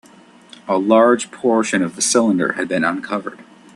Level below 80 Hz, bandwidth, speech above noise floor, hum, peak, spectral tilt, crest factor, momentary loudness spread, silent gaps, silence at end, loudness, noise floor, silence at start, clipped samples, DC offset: -64 dBFS; 12.5 kHz; 29 dB; none; 0 dBFS; -3.5 dB/octave; 18 dB; 12 LU; none; 0.35 s; -17 LUFS; -46 dBFS; 0.65 s; under 0.1%; under 0.1%